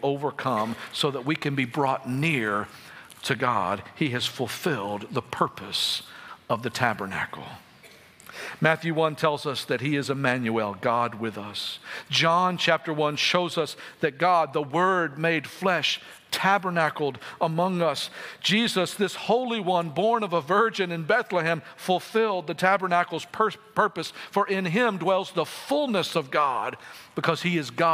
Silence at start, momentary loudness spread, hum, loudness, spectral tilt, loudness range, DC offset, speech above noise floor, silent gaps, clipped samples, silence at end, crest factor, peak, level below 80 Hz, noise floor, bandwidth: 0 s; 9 LU; none; -25 LUFS; -4.5 dB/octave; 4 LU; under 0.1%; 26 dB; none; under 0.1%; 0 s; 22 dB; -4 dBFS; -72 dBFS; -52 dBFS; 16 kHz